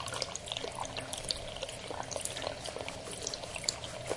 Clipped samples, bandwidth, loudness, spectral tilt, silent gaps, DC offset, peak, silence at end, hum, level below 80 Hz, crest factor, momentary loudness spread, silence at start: under 0.1%; 11.5 kHz; -38 LUFS; -2 dB/octave; none; under 0.1%; -10 dBFS; 0 s; none; -56 dBFS; 28 dB; 5 LU; 0 s